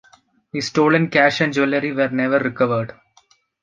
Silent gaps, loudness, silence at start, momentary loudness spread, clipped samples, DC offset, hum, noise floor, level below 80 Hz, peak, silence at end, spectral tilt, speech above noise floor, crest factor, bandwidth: none; -18 LUFS; 0.55 s; 10 LU; under 0.1%; under 0.1%; none; -58 dBFS; -62 dBFS; -2 dBFS; 0.7 s; -5.5 dB/octave; 40 dB; 18 dB; 9.4 kHz